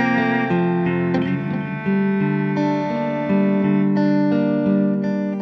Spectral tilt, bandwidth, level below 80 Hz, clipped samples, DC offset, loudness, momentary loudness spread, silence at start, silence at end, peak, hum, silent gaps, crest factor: -9 dB/octave; 6.2 kHz; -60 dBFS; under 0.1%; under 0.1%; -19 LUFS; 5 LU; 0 s; 0 s; -6 dBFS; none; none; 12 dB